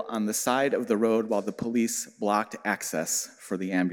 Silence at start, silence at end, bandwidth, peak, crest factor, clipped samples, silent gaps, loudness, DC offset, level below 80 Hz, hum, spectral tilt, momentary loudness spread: 0 s; 0 s; 17 kHz; -8 dBFS; 18 dB; under 0.1%; none; -27 LUFS; under 0.1%; -70 dBFS; none; -4 dB/octave; 5 LU